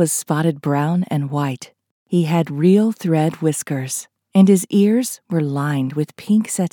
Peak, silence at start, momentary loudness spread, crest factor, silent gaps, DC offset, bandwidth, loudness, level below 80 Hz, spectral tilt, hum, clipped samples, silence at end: -2 dBFS; 0 s; 9 LU; 16 dB; 1.91-2.06 s; under 0.1%; 19 kHz; -18 LUFS; -74 dBFS; -6 dB/octave; none; under 0.1%; 0.05 s